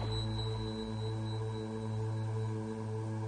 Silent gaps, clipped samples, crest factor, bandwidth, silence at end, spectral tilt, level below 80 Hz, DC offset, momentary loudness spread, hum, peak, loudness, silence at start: none; under 0.1%; 12 dB; 9.6 kHz; 0 s; -7 dB/octave; -52 dBFS; under 0.1%; 3 LU; none; -24 dBFS; -38 LUFS; 0 s